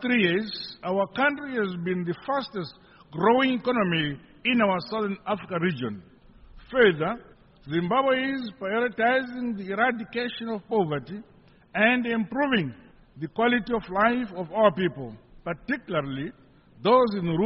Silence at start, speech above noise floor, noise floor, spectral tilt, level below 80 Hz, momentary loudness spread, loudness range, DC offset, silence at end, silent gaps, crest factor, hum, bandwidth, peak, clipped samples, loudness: 0 s; 24 dB; -50 dBFS; -3.5 dB/octave; -58 dBFS; 14 LU; 2 LU; under 0.1%; 0 s; none; 20 dB; none; 5.8 kHz; -6 dBFS; under 0.1%; -26 LUFS